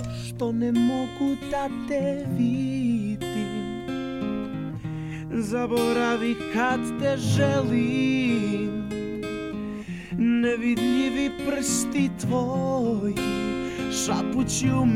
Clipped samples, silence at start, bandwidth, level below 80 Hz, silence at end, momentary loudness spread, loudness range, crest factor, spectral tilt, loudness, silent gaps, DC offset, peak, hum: under 0.1%; 0 s; 15.5 kHz; -48 dBFS; 0 s; 9 LU; 4 LU; 16 dB; -5.5 dB/octave; -26 LUFS; none; under 0.1%; -10 dBFS; none